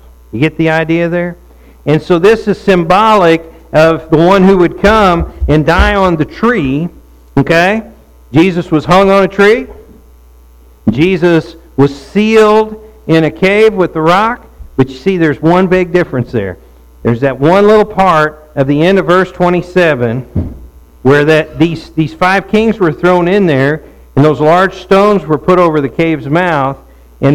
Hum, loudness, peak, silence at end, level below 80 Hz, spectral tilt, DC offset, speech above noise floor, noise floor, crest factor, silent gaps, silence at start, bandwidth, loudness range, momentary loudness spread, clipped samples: none; -10 LUFS; 0 dBFS; 0 s; -28 dBFS; -7 dB/octave; under 0.1%; 30 dB; -39 dBFS; 10 dB; none; 0.35 s; 15.5 kHz; 3 LU; 10 LU; under 0.1%